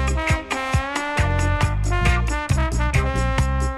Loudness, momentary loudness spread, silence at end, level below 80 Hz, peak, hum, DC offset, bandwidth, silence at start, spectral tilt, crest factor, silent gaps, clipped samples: -21 LUFS; 3 LU; 0 s; -24 dBFS; -6 dBFS; none; under 0.1%; 13 kHz; 0 s; -5.5 dB/octave; 14 dB; none; under 0.1%